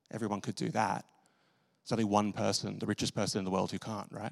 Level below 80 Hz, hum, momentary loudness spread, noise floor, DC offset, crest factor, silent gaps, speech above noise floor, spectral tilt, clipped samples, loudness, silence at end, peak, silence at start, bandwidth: -72 dBFS; none; 10 LU; -73 dBFS; under 0.1%; 22 dB; none; 39 dB; -5 dB/octave; under 0.1%; -34 LUFS; 0 s; -12 dBFS; 0.15 s; 13.5 kHz